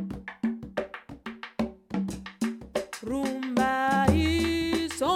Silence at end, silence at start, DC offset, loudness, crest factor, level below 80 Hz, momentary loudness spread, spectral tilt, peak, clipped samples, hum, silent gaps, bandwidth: 0 s; 0 s; under 0.1%; -29 LUFS; 20 dB; -44 dBFS; 14 LU; -5.5 dB/octave; -8 dBFS; under 0.1%; none; none; 16 kHz